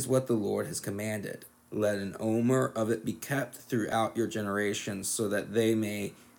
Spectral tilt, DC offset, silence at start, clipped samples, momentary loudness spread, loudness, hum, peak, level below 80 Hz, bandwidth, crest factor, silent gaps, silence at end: -5 dB/octave; under 0.1%; 0 s; under 0.1%; 7 LU; -31 LUFS; none; -14 dBFS; -70 dBFS; 19 kHz; 16 dB; none; 0.25 s